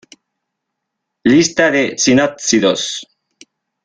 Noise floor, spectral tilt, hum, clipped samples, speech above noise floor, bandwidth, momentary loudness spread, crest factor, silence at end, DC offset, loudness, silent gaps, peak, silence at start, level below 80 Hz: -77 dBFS; -3.5 dB/octave; none; under 0.1%; 63 dB; 9.8 kHz; 8 LU; 16 dB; 0.8 s; under 0.1%; -13 LUFS; none; 0 dBFS; 1.25 s; -54 dBFS